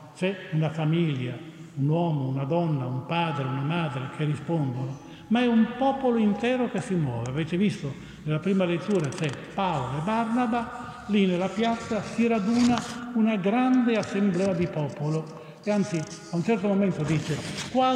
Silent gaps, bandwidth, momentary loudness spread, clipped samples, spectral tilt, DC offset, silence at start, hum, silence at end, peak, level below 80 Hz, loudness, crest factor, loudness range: none; 11 kHz; 8 LU; under 0.1%; -6.5 dB/octave; under 0.1%; 0 s; none; 0 s; -10 dBFS; -58 dBFS; -26 LUFS; 16 dB; 3 LU